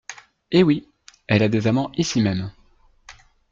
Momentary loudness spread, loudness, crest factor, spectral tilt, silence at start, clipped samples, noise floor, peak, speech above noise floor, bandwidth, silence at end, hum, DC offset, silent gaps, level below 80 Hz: 11 LU; -21 LUFS; 18 dB; -6 dB/octave; 0.1 s; under 0.1%; -56 dBFS; -4 dBFS; 37 dB; 7.6 kHz; 0.4 s; none; under 0.1%; none; -54 dBFS